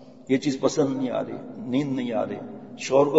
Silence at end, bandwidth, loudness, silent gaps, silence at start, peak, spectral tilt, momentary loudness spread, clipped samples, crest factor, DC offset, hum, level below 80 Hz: 0 s; 8 kHz; -26 LUFS; none; 0 s; -4 dBFS; -5.5 dB/octave; 12 LU; under 0.1%; 20 dB; 0.2%; none; -70 dBFS